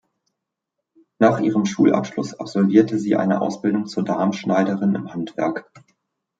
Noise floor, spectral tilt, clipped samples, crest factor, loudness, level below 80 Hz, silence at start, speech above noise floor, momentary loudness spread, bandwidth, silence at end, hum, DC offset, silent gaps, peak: -81 dBFS; -7 dB/octave; under 0.1%; 18 dB; -20 LUFS; -66 dBFS; 1.2 s; 62 dB; 9 LU; 7.8 kHz; 0.8 s; none; under 0.1%; none; -2 dBFS